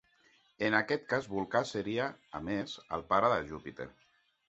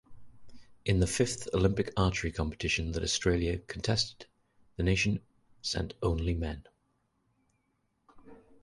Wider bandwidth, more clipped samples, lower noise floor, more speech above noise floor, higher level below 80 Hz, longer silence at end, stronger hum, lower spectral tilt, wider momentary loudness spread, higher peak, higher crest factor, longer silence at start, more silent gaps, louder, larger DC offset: second, 8 kHz vs 11.5 kHz; neither; second, -68 dBFS vs -76 dBFS; second, 35 dB vs 46 dB; second, -64 dBFS vs -42 dBFS; first, 0.6 s vs 0.25 s; neither; about the same, -3.5 dB/octave vs -4.5 dB/octave; first, 14 LU vs 8 LU; about the same, -12 dBFS vs -12 dBFS; about the same, 22 dB vs 22 dB; first, 0.6 s vs 0.1 s; neither; about the same, -33 LUFS vs -31 LUFS; neither